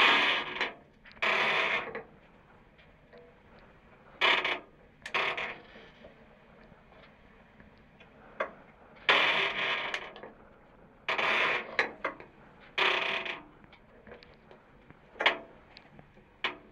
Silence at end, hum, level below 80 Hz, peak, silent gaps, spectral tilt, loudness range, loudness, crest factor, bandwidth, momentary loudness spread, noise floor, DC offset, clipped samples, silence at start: 0.15 s; none; -66 dBFS; -8 dBFS; none; -2.5 dB/octave; 9 LU; -29 LUFS; 26 dB; 14 kHz; 21 LU; -59 dBFS; under 0.1%; under 0.1%; 0 s